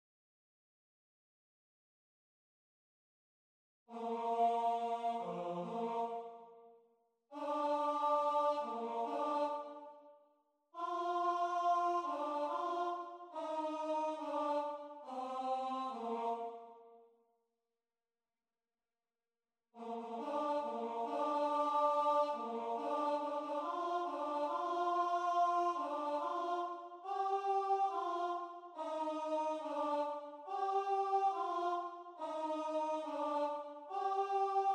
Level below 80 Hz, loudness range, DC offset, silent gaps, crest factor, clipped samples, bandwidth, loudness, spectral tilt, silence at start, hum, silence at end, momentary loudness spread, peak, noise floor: under -90 dBFS; 7 LU; under 0.1%; none; 16 dB; under 0.1%; 9.8 kHz; -38 LUFS; -5 dB/octave; 3.9 s; none; 0 s; 12 LU; -24 dBFS; under -90 dBFS